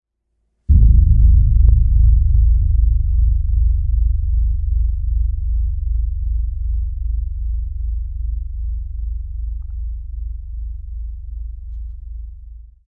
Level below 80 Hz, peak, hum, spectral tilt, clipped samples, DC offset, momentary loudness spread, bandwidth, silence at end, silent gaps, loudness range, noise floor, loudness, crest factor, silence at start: -16 dBFS; 0 dBFS; none; -14 dB/octave; under 0.1%; under 0.1%; 18 LU; 0.5 kHz; 0.25 s; none; 14 LU; -69 dBFS; -19 LUFS; 16 dB; 0.7 s